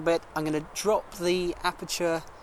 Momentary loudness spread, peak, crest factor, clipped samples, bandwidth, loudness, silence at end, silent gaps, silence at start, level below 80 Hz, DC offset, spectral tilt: 3 LU; -12 dBFS; 18 dB; under 0.1%; 17.5 kHz; -29 LUFS; 0 s; none; 0 s; -52 dBFS; under 0.1%; -4 dB/octave